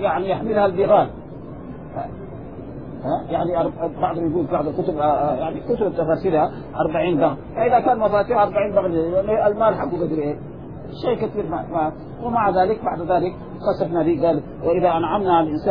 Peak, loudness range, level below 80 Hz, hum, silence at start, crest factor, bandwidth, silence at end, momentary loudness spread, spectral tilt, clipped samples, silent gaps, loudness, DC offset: -6 dBFS; 4 LU; -44 dBFS; none; 0 s; 16 dB; 5.2 kHz; 0 s; 14 LU; -10.5 dB/octave; under 0.1%; none; -20 LUFS; 0.5%